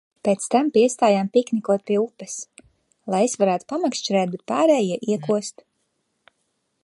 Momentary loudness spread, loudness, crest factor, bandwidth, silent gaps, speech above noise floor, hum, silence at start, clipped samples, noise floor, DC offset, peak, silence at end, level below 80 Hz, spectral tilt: 14 LU; -21 LUFS; 18 dB; 11.5 kHz; none; 52 dB; none; 0.25 s; under 0.1%; -73 dBFS; under 0.1%; -4 dBFS; 1.35 s; -72 dBFS; -5 dB/octave